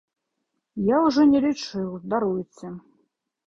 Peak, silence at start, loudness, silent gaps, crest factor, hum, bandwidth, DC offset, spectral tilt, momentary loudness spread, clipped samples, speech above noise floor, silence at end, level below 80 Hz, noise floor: -8 dBFS; 0.75 s; -22 LUFS; none; 16 dB; none; 7.6 kHz; under 0.1%; -6.5 dB/octave; 21 LU; under 0.1%; 56 dB; 0.7 s; -60 dBFS; -78 dBFS